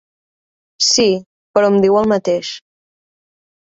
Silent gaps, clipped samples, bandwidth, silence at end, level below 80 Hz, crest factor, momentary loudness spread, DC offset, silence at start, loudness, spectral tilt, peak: 1.26-1.54 s; under 0.1%; 8.2 kHz; 1.05 s; -56 dBFS; 16 dB; 11 LU; under 0.1%; 0.8 s; -15 LUFS; -3.5 dB/octave; 0 dBFS